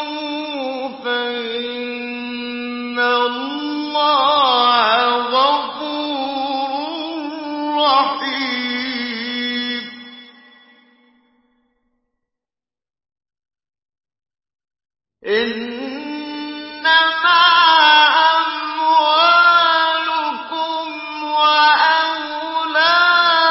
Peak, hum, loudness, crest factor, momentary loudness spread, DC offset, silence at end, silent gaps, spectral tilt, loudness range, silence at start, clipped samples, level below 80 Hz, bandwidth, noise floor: -2 dBFS; none; -16 LUFS; 16 dB; 15 LU; under 0.1%; 0 s; none; -5 dB/octave; 14 LU; 0 s; under 0.1%; -64 dBFS; 5.8 kHz; under -90 dBFS